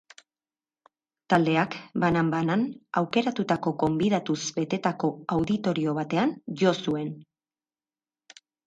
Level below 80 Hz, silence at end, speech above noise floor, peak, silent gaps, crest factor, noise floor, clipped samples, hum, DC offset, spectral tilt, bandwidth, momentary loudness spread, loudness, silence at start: -62 dBFS; 1.45 s; over 64 dB; -8 dBFS; none; 20 dB; under -90 dBFS; under 0.1%; none; under 0.1%; -6 dB/octave; 9.2 kHz; 5 LU; -26 LUFS; 1.3 s